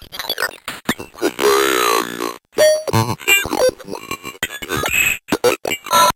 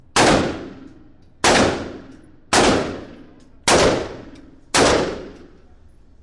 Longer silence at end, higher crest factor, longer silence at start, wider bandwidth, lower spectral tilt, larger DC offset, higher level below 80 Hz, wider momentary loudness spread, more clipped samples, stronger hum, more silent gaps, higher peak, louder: second, 0.05 s vs 0.85 s; about the same, 14 dB vs 16 dB; second, 0 s vs 0.15 s; first, 17 kHz vs 11.5 kHz; about the same, -3 dB/octave vs -3 dB/octave; neither; second, -46 dBFS vs -40 dBFS; second, 11 LU vs 20 LU; neither; neither; neither; about the same, -4 dBFS vs -4 dBFS; about the same, -17 LUFS vs -17 LUFS